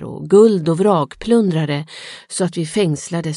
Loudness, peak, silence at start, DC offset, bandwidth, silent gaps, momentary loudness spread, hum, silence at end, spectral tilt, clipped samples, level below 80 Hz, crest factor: -16 LUFS; 0 dBFS; 0 s; under 0.1%; 11.5 kHz; none; 13 LU; none; 0 s; -6 dB/octave; under 0.1%; -52 dBFS; 16 dB